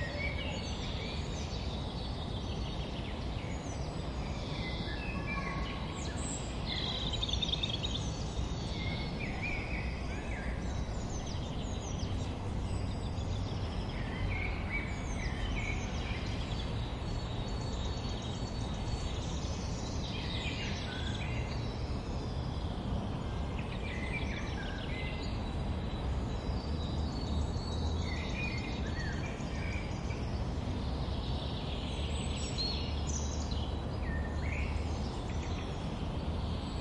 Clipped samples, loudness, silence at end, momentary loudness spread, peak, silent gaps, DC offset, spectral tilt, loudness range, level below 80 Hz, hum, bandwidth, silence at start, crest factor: under 0.1%; -37 LUFS; 0 s; 3 LU; -20 dBFS; none; under 0.1%; -5 dB/octave; 3 LU; -40 dBFS; none; 11 kHz; 0 s; 16 dB